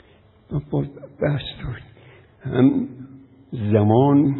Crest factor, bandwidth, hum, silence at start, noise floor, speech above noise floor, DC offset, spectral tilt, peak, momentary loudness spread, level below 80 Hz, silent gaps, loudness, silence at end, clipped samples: 18 dB; 4.1 kHz; none; 0.5 s; -52 dBFS; 33 dB; under 0.1%; -13 dB/octave; -2 dBFS; 19 LU; -46 dBFS; none; -21 LUFS; 0 s; under 0.1%